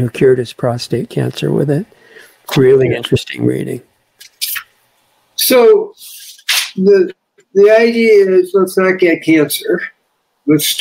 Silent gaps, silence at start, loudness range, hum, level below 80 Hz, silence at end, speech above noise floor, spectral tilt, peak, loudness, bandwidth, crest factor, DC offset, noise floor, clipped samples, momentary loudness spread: none; 0 s; 5 LU; none; -54 dBFS; 0 s; 52 dB; -5 dB/octave; 0 dBFS; -12 LUFS; 16.5 kHz; 12 dB; under 0.1%; -63 dBFS; under 0.1%; 15 LU